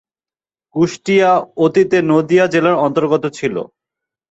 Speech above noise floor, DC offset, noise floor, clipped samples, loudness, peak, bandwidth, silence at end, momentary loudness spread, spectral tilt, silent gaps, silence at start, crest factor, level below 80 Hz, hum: over 76 dB; under 0.1%; under -90 dBFS; under 0.1%; -14 LUFS; -2 dBFS; 8 kHz; 0.65 s; 9 LU; -6 dB/octave; none; 0.75 s; 14 dB; -58 dBFS; none